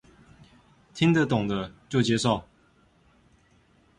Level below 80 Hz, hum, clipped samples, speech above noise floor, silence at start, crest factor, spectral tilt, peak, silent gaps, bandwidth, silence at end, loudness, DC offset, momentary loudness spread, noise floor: -56 dBFS; none; under 0.1%; 38 dB; 0.95 s; 20 dB; -5.5 dB/octave; -8 dBFS; none; 11.5 kHz; 1.55 s; -25 LUFS; under 0.1%; 9 LU; -62 dBFS